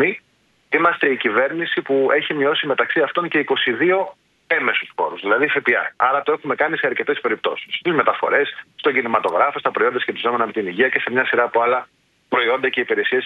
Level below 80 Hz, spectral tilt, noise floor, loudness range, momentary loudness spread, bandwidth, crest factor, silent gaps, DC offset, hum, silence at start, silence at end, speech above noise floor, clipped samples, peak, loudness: -70 dBFS; -6.5 dB/octave; -61 dBFS; 1 LU; 5 LU; 5 kHz; 18 dB; none; under 0.1%; none; 0 s; 0 s; 42 dB; under 0.1%; -2 dBFS; -19 LUFS